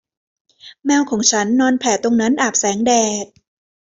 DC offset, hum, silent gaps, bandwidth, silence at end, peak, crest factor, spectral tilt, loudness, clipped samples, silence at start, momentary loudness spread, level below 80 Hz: under 0.1%; none; none; 8 kHz; 0.6 s; -2 dBFS; 16 dB; -2.5 dB/octave; -16 LUFS; under 0.1%; 0.65 s; 7 LU; -60 dBFS